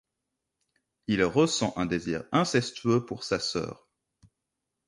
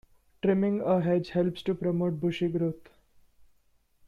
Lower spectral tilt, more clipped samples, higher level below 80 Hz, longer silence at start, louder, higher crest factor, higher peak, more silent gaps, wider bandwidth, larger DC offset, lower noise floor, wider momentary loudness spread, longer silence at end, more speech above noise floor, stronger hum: second, -5 dB/octave vs -9 dB/octave; neither; about the same, -58 dBFS vs -62 dBFS; first, 1.1 s vs 0.45 s; about the same, -27 LUFS vs -28 LUFS; about the same, 20 dB vs 16 dB; first, -10 dBFS vs -14 dBFS; neither; first, 11.5 kHz vs 7 kHz; neither; first, -84 dBFS vs -67 dBFS; first, 8 LU vs 5 LU; about the same, 1.15 s vs 1.25 s; first, 57 dB vs 40 dB; neither